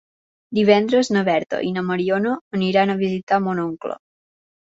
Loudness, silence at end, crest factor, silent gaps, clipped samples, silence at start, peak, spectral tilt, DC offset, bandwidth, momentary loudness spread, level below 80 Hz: -20 LUFS; 0.7 s; 18 dB; 2.41-2.51 s, 3.23-3.27 s; under 0.1%; 0.5 s; -2 dBFS; -6 dB/octave; under 0.1%; 8 kHz; 10 LU; -62 dBFS